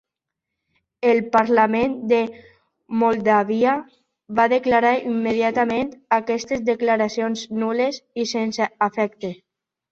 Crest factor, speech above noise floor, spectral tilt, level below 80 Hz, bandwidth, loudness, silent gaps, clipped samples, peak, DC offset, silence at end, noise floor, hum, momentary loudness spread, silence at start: 18 dB; 63 dB; -5 dB/octave; -60 dBFS; 7.6 kHz; -21 LUFS; none; under 0.1%; -2 dBFS; under 0.1%; 0.6 s; -83 dBFS; none; 8 LU; 1 s